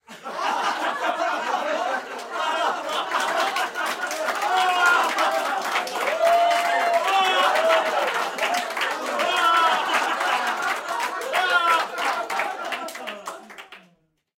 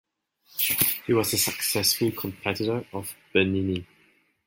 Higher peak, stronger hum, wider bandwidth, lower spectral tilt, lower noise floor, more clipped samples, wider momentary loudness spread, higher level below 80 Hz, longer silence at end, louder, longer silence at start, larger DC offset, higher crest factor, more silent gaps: about the same, -6 dBFS vs -6 dBFS; neither; about the same, 17 kHz vs 17 kHz; second, -0.5 dB/octave vs -3.5 dB/octave; about the same, -64 dBFS vs -63 dBFS; neither; about the same, 10 LU vs 11 LU; second, -76 dBFS vs -64 dBFS; about the same, 0.6 s vs 0.65 s; about the same, -22 LUFS vs -24 LUFS; second, 0.1 s vs 0.55 s; neither; second, 16 dB vs 22 dB; neither